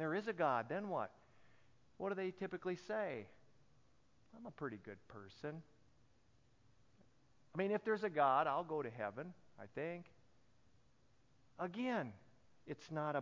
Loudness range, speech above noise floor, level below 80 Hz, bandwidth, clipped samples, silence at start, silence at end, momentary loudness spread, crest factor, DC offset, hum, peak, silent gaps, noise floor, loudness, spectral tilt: 14 LU; 33 dB; -80 dBFS; 7.2 kHz; under 0.1%; 0 s; 0 s; 18 LU; 22 dB; under 0.1%; none; -22 dBFS; none; -75 dBFS; -42 LUFS; -5 dB/octave